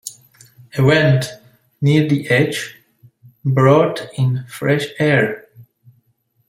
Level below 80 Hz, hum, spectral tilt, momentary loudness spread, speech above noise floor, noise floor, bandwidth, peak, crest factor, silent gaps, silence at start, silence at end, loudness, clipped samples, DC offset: -54 dBFS; none; -6.5 dB/octave; 15 LU; 47 dB; -63 dBFS; 16 kHz; -2 dBFS; 16 dB; none; 0.05 s; 0.85 s; -16 LUFS; under 0.1%; under 0.1%